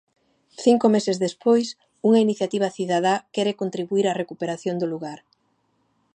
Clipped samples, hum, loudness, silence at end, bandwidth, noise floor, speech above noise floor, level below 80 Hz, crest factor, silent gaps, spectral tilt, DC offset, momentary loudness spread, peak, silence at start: under 0.1%; none; -22 LUFS; 1 s; 9.4 kHz; -68 dBFS; 47 dB; -74 dBFS; 18 dB; none; -5.5 dB/octave; under 0.1%; 10 LU; -4 dBFS; 0.6 s